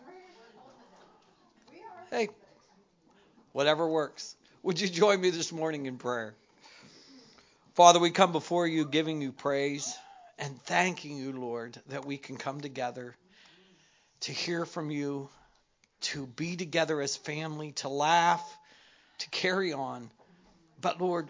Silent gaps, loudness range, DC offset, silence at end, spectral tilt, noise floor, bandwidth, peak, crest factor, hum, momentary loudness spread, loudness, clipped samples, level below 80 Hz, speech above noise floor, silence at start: none; 11 LU; under 0.1%; 0 s; -3.5 dB/octave; -70 dBFS; 7.6 kHz; -4 dBFS; 28 dB; none; 16 LU; -30 LUFS; under 0.1%; -78 dBFS; 40 dB; 0.05 s